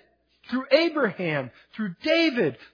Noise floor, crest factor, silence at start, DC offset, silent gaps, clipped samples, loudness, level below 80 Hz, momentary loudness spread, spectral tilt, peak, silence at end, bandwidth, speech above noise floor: -54 dBFS; 20 dB; 0.5 s; under 0.1%; none; under 0.1%; -24 LUFS; -72 dBFS; 12 LU; -6 dB/octave; -6 dBFS; 0.2 s; 5.2 kHz; 29 dB